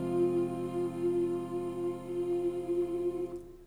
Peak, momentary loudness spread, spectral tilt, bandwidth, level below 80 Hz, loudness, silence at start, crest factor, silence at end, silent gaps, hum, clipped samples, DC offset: -20 dBFS; 6 LU; -8 dB/octave; 10.5 kHz; -58 dBFS; -33 LUFS; 0 s; 14 dB; 0 s; none; none; under 0.1%; under 0.1%